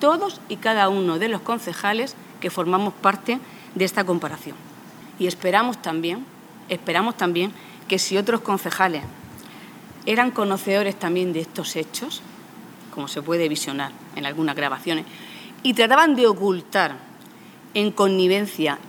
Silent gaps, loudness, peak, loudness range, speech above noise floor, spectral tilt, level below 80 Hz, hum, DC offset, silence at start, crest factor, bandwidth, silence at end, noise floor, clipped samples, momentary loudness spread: none; -22 LUFS; 0 dBFS; 6 LU; 23 dB; -4 dB/octave; -68 dBFS; none; under 0.1%; 0 s; 22 dB; over 20 kHz; 0 s; -45 dBFS; under 0.1%; 19 LU